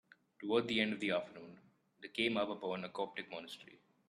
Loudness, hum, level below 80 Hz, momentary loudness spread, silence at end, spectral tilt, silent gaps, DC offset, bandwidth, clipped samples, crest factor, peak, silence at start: -38 LUFS; none; -80 dBFS; 18 LU; 0.35 s; -5 dB/octave; none; under 0.1%; 12.5 kHz; under 0.1%; 22 dB; -20 dBFS; 0.4 s